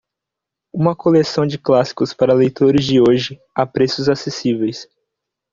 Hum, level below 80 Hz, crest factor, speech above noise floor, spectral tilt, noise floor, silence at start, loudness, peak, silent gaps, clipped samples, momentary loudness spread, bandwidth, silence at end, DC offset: none; -52 dBFS; 14 dB; 68 dB; -6.5 dB/octave; -83 dBFS; 0.75 s; -16 LUFS; -2 dBFS; none; under 0.1%; 8 LU; 7.6 kHz; 0.7 s; under 0.1%